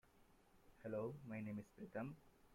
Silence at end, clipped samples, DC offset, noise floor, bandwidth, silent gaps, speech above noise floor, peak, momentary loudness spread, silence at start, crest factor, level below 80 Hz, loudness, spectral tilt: 0 s; under 0.1%; under 0.1%; -72 dBFS; 16.5 kHz; none; 23 dB; -36 dBFS; 7 LU; 0.05 s; 16 dB; -76 dBFS; -51 LUFS; -8.5 dB/octave